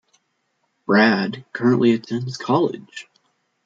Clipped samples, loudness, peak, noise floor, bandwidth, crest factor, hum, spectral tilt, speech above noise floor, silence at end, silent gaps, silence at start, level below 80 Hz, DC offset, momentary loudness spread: under 0.1%; -19 LUFS; -4 dBFS; -70 dBFS; 7.8 kHz; 18 dB; none; -6.5 dB/octave; 51 dB; 0.65 s; none; 0.9 s; -66 dBFS; under 0.1%; 20 LU